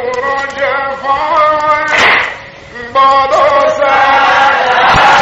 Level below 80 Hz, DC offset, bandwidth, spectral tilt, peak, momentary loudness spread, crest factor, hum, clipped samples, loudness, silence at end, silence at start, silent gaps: -38 dBFS; under 0.1%; 10.5 kHz; -3 dB/octave; 0 dBFS; 8 LU; 10 dB; none; 0.1%; -9 LUFS; 0 s; 0 s; none